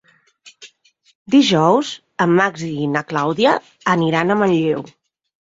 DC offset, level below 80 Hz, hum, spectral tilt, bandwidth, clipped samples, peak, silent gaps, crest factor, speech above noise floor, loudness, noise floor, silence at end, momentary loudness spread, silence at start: under 0.1%; -60 dBFS; none; -5.5 dB/octave; 7.8 kHz; under 0.1%; -2 dBFS; 1.15-1.26 s; 16 dB; 39 dB; -17 LUFS; -55 dBFS; 0.65 s; 8 LU; 0.45 s